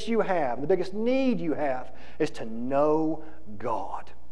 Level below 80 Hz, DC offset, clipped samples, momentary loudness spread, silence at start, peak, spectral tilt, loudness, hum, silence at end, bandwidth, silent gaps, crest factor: -54 dBFS; 3%; under 0.1%; 13 LU; 0 s; -10 dBFS; -7 dB/octave; -28 LUFS; none; 0.15 s; 11 kHz; none; 16 dB